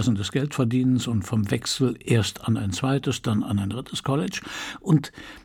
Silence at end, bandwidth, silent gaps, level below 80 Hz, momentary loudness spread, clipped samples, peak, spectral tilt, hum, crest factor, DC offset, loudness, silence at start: 0.05 s; 17 kHz; none; -54 dBFS; 7 LU; under 0.1%; -6 dBFS; -5.5 dB/octave; none; 18 dB; under 0.1%; -25 LUFS; 0 s